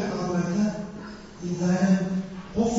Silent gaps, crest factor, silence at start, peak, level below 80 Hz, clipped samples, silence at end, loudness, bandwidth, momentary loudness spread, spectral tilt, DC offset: none; 14 dB; 0 s; -12 dBFS; -52 dBFS; under 0.1%; 0 s; -26 LUFS; 8 kHz; 15 LU; -7 dB/octave; under 0.1%